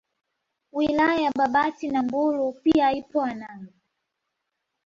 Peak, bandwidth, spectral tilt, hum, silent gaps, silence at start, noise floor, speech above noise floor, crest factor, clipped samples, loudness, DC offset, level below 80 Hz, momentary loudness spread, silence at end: -8 dBFS; 7.4 kHz; -6 dB/octave; none; none; 0.75 s; -80 dBFS; 57 dB; 16 dB; under 0.1%; -23 LUFS; under 0.1%; -58 dBFS; 10 LU; 1.2 s